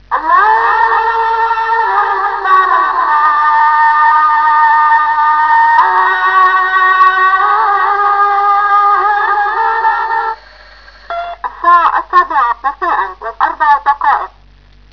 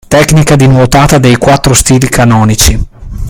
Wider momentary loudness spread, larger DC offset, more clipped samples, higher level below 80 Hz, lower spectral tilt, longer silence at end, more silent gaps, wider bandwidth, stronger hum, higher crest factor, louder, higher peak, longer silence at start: first, 8 LU vs 3 LU; first, 0.4% vs under 0.1%; second, under 0.1% vs 5%; second, -46 dBFS vs -18 dBFS; second, -3 dB/octave vs -5 dB/octave; first, 0.65 s vs 0 s; neither; second, 5.4 kHz vs over 20 kHz; neither; about the same, 10 dB vs 6 dB; second, -10 LUFS vs -5 LUFS; about the same, 0 dBFS vs 0 dBFS; about the same, 0.1 s vs 0.1 s